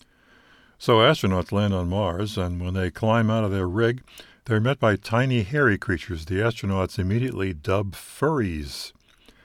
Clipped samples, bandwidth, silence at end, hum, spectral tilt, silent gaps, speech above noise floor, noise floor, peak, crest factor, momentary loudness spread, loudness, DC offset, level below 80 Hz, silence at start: under 0.1%; 16 kHz; 0.55 s; none; -6.5 dB/octave; none; 33 dB; -56 dBFS; -4 dBFS; 20 dB; 8 LU; -24 LUFS; under 0.1%; -46 dBFS; 0.8 s